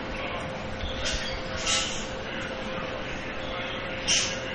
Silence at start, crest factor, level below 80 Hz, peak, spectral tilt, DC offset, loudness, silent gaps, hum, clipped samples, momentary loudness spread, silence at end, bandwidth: 0 s; 20 dB; -42 dBFS; -12 dBFS; -2 dB/octave; under 0.1%; -29 LUFS; none; none; under 0.1%; 10 LU; 0 s; 9.4 kHz